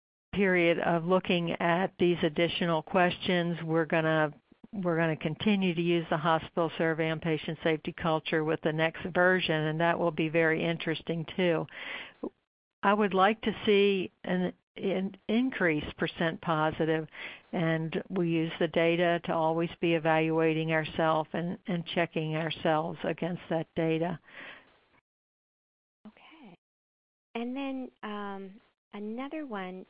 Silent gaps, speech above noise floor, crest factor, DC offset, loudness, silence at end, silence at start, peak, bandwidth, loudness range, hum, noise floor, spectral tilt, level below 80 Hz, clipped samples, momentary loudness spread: 12.47-12.82 s, 14.63-14.75 s, 25.01-26.04 s, 26.58-27.34 s, 28.78-28.91 s; 24 dB; 20 dB; under 0.1%; -29 LUFS; 0.05 s; 0.35 s; -10 dBFS; 5.2 kHz; 11 LU; none; -54 dBFS; -10 dB/octave; -64 dBFS; under 0.1%; 12 LU